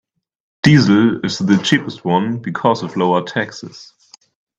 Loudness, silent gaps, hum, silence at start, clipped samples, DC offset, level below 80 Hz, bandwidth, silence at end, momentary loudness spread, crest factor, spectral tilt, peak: -16 LUFS; none; none; 0.65 s; under 0.1%; under 0.1%; -52 dBFS; 8 kHz; 0.75 s; 11 LU; 16 dB; -6 dB/octave; 0 dBFS